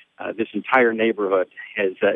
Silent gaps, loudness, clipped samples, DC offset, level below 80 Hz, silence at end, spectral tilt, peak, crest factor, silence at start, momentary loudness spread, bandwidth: none; -21 LUFS; under 0.1%; under 0.1%; -70 dBFS; 0 s; -7.5 dB/octave; -4 dBFS; 18 dB; 0.2 s; 10 LU; 4.4 kHz